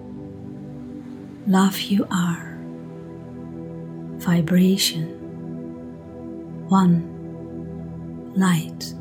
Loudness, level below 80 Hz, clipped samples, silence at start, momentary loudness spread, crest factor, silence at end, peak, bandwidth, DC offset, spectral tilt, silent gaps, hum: -22 LUFS; -56 dBFS; under 0.1%; 0 s; 18 LU; 18 dB; 0 s; -6 dBFS; 18 kHz; under 0.1%; -5.5 dB/octave; none; none